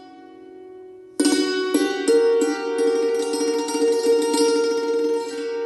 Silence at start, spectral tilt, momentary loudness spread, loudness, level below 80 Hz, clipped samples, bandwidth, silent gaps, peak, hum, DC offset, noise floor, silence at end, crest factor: 0 s; -2 dB/octave; 6 LU; -20 LUFS; -72 dBFS; under 0.1%; 12 kHz; none; -6 dBFS; none; under 0.1%; -43 dBFS; 0 s; 16 dB